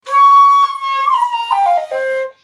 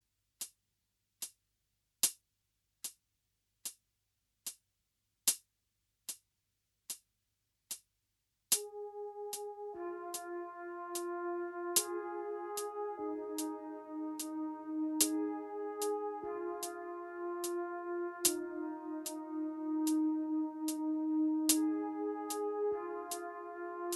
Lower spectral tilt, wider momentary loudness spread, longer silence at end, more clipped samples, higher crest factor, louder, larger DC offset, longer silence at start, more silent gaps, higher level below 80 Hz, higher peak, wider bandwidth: second, 0.5 dB/octave vs -1 dB/octave; second, 11 LU vs 14 LU; about the same, 0.1 s vs 0 s; neither; second, 10 dB vs 26 dB; first, -12 LUFS vs -38 LUFS; neither; second, 0.05 s vs 0.4 s; neither; first, -74 dBFS vs -84 dBFS; first, -2 dBFS vs -12 dBFS; second, 11 kHz vs 13 kHz